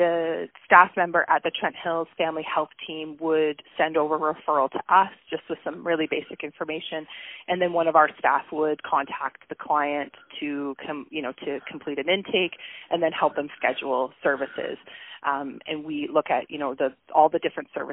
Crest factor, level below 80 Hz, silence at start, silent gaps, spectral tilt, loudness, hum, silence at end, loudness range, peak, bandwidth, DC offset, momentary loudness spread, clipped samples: 24 dB; -70 dBFS; 0 s; none; 1 dB/octave; -25 LUFS; none; 0 s; 5 LU; 0 dBFS; 3.9 kHz; under 0.1%; 13 LU; under 0.1%